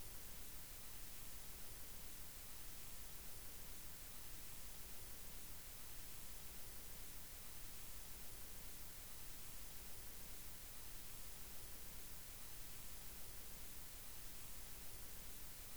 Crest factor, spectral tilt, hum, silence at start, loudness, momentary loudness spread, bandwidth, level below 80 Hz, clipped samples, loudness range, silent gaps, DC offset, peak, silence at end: 14 dB; -2 dB/octave; none; 0 s; -52 LUFS; 0 LU; over 20 kHz; -60 dBFS; under 0.1%; 0 LU; none; 0.2%; -38 dBFS; 0 s